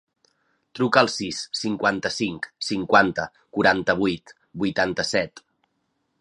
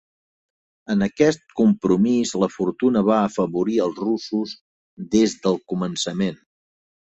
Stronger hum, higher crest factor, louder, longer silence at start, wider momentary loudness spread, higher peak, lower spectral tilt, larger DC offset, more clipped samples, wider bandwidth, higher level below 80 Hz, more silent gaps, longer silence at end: neither; first, 24 dB vs 18 dB; about the same, -23 LUFS vs -21 LUFS; second, 0.75 s vs 0.9 s; first, 12 LU vs 8 LU; about the same, -2 dBFS vs -4 dBFS; second, -4 dB/octave vs -6 dB/octave; neither; neither; first, 11 kHz vs 8.2 kHz; about the same, -56 dBFS vs -56 dBFS; second, none vs 4.61-4.97 s; about the same, 0.8 s vs 0.75 s